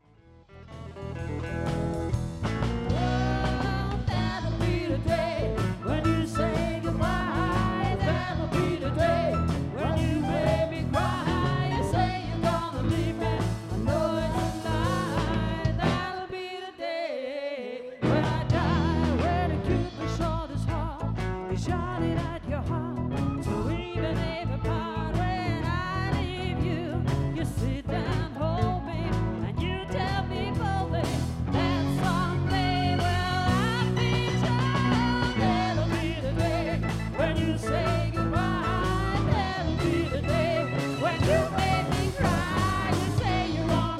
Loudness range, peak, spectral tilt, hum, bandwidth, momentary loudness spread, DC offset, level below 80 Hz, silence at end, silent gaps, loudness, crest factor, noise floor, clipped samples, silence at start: 4 LU; -10 dBFS; -6.5 dB/octave; none; 14 kHz; 6 LU; under 0.1%; -38 dBFS; 0 s; none; -28 LUFS; 16 dB; -55 dBFS; under 0.1%; 0.55 s